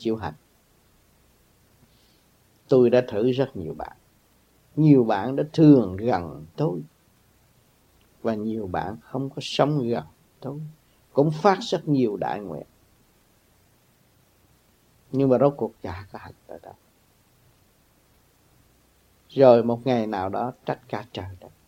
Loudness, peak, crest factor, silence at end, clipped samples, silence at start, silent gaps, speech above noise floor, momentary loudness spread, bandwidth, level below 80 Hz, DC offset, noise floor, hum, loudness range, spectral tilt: -23 LUFS; -2 dBFS; 22 dB; 0.2 s; under 0.1%; 0 s; none; 39 dB; 20 LU; 15.5 kHz; -60 dBFS; under 0.1%; -61 dBFS; none; 9 LU; -8 dB/octave